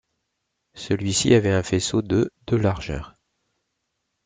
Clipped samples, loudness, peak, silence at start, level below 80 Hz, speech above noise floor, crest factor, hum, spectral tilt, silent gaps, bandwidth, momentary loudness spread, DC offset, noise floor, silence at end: under 0.1%; -22 LUFS; -4 dBFS; 0.75 s; -46 dBFS; 56 dB; 20 dB; none; -5 dB/octave; none; 9.6 kHz; 13 LU; under 0.1%; -77 dBFS; 1.15 s